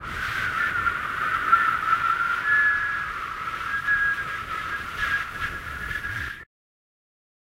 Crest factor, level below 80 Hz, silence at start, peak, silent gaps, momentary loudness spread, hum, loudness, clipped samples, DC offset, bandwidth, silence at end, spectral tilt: 20 dB; -48 dBFS; 0 s; -6 dBFS; none; 11 LU; none; -24 LUFS; under 0.1%; under 0.1%; 16 kHz; 1 s; -3 dB/octave